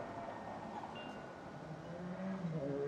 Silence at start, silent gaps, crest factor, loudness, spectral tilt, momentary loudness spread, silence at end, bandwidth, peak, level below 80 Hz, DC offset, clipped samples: 0 s; none; 14 dB; -46 LUFS; -7.5 dB/octave; 8 LU; 0 s; 10.5 kHz; -30 dBFS; -70 dBFS; under 0.1%; under 0.1%